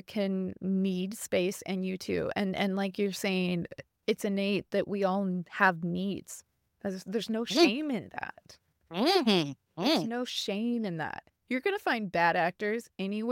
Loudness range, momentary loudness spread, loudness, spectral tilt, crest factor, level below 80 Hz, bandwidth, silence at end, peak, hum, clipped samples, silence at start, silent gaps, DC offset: 3 LU; 12 LU; -30 LUFS; -5 dB/octave; 22 dB; -70 dBFS; 17 kHz; 0 s; -10 dBFS; none; under 0.1%; 0.1 s; none; under 0.1%